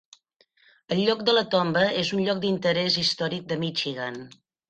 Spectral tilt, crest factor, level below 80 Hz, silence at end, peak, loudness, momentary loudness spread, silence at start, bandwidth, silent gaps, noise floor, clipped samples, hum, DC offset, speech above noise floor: -5 dB/octave; 18 dB; -64 dBFS; 0.4 s; -8 dBFS; -24 LUFS; 8 LU; 0.9 s; 9 kHz; none; -64 dBFS; under 0.1%; none; under 0.1%; 39 dB